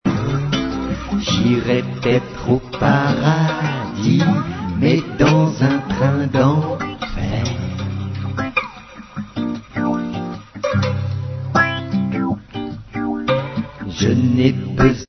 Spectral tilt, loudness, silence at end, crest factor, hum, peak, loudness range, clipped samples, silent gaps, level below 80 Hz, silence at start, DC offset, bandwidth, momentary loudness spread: -6.5 dB/octave; -19 LUFS; 0.05 s; 18 dB; none; 0 dBFS; 6 LU; under 0.1%; none; -38 dBFS; 0.05 s; under 0.1%; 6.4 kHz; 10 LU